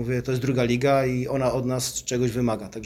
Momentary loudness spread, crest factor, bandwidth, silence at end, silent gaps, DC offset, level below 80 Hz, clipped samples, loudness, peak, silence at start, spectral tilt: 5 LU; 16 dB; 15.5 kHz; 0 s; none; under 0.1%; -48 dBFS; under 0.1%; -24 LUFS; -8 dBFS; 0 s; -5.5 dB/octave